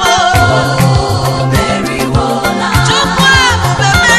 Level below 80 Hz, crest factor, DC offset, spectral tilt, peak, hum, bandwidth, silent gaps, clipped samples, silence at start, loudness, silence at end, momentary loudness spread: -24 dBFS; 10 dB; under 0.1%; -4 dB/octave; 0 dBFS; none; 14.5 kHz; none; 0.1%; 0 s; -10 LUFS; 0 s; 6 LU